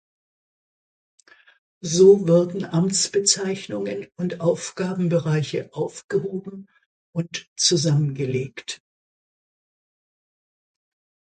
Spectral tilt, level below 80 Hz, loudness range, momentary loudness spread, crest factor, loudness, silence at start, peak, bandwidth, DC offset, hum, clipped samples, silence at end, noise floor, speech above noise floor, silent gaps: -4.5 dB/octave; -66 dBFS; 6 LU; 16 LU; 20 dB; -21 LUFS; 1.85 s; -4 dBFS; 9.4 kHz; under 0.1%; none; under 0.1%; 2.6 s; under -90 dBFS; over 69 dB; 6.04-6.09 s, 6.86-7.13 s, 7.47-7.56 s